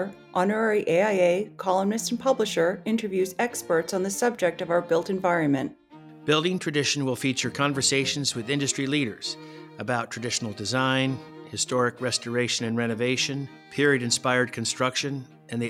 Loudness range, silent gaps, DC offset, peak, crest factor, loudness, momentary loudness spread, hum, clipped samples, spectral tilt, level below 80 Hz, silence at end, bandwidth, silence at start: 2 LU; none; under 0.1%; -8 dBFS; 18 dB; -25 LUFS; 7 LU; none; under 0.1%; -3.5 dB/octave; -68 dBFS; 0 s; 16.5 kHz; 0 s